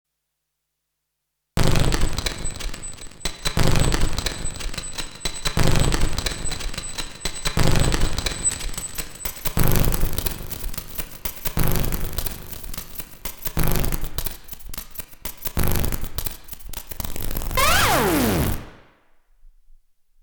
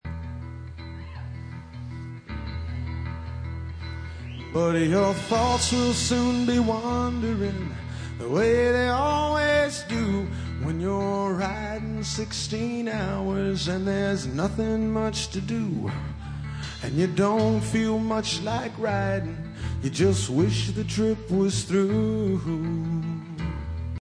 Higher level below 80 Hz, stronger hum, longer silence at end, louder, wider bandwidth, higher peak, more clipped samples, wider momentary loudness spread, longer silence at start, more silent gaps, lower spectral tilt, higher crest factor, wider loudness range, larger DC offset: first, -28 dBFS vs -40 dBFS; neither; first, 0.75 s vs 0 s; about the same, -24 LUFS vs -26 LUFS; first, over 20 kHz vs 10.5 kHz; first, -2 dBFS vs -10 dBFS; neither; about the same, 12 LU vs 14 LU; first, 1.55 s vs 0.05 s; neither; second, -4 dB/octave vs -5.5 dB/octave; about the same, 20 dB vs 16 dB; about the same, 5 LU vs 4 LU; neither